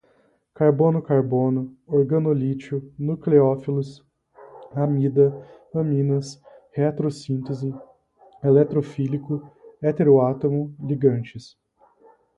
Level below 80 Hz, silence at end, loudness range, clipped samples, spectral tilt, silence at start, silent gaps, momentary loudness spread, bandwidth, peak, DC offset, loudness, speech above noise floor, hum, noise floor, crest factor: -62 dBFS; 0.95 s; 3 LU; under 0.1%; -9.5 dB/octave; 0.6 s; none; 13 LU; 9 kHz; -4 dBFS; under 0.1%; -22 LUFS; 41 dB; none; -62 dBFS; 18 dB